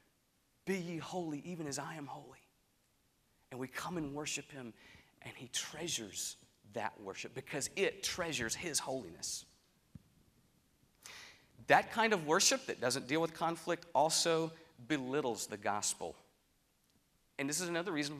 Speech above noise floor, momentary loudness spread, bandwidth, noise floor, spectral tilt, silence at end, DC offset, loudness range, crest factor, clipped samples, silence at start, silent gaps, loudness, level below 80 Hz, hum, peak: 38 dB; 21 LU; 15.5 kHz; -76 dBFS; -2.5 dB/octave; 0 s; under 0.1%; 11 LU; 28 dB; under 0.1%; 0.65 s; none; -36 LUFS; -74 dBFS; none; -10 dBFS